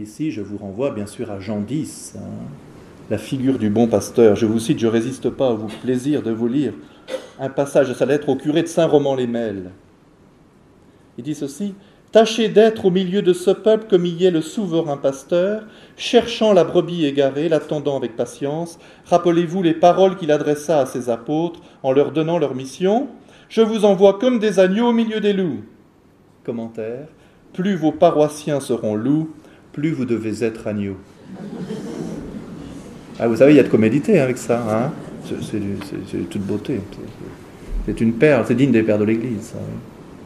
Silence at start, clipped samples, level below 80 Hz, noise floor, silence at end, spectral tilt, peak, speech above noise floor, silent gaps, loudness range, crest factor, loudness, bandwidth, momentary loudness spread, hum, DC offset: 0 s; under 0.1%; -46 dBFS; -51 dBFS; 0 s; -6.5 dB/octave; 0 dBFS; 33 dB; none; 7 LU; 18 dB; -19 LUFS; 13.5 kHz; 17 LU; none; under 0.1%